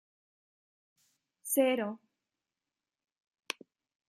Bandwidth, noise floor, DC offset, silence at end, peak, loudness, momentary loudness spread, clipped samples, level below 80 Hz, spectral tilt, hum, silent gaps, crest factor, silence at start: 15.5 kHz; under -90 dBFS; under 0.1%; 2.15 s; -16 dBFS; -33 LUFS; 18 LU; under 0.1%; under -90 dBFS; -3 dB/octave; none; none; 24 dB; 1.45 s